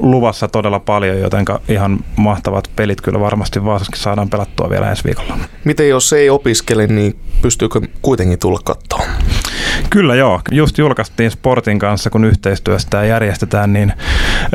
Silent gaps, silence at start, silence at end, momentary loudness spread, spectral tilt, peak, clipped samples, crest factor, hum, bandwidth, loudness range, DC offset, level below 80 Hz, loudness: none; 0 s; 0 s; 7 LU; -5.5 dB/octave; 0 dBFS; under 0.1%; 12 dB; none; 16 kHz; 3 LU; under 0.1%; -22 dBFS; -14 LUFS